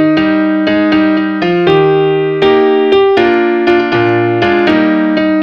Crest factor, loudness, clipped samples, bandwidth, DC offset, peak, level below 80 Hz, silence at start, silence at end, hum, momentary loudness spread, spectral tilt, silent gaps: 10 dB; -10 LUFS; under 0.1%; 6.4 kHz; under 0.1%; 0 dBFS; -44 dBFS; 0 s; 0 s; none; 3 LU; -7.5 dB/octave; none